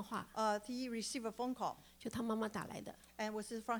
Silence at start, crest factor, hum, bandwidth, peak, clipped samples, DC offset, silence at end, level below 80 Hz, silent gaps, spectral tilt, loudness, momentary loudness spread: 0 s; 18 dB; none; over 20 kHz; -24 dBFS; under 0.1%; under 0.1%; 0 s; -72 dBFS; none; -4 dB/octave; -42 LUFS; 10 LU